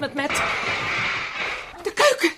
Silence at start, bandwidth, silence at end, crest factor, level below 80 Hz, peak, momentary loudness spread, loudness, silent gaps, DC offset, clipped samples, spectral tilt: 0 s; 15.5 kHz; 0 s; 18 dB; -52 dBFS; -4 dBFS; 9 LU; -23 LUFS; none; under 0.1%; under 0.1%; -2.5 dB/octave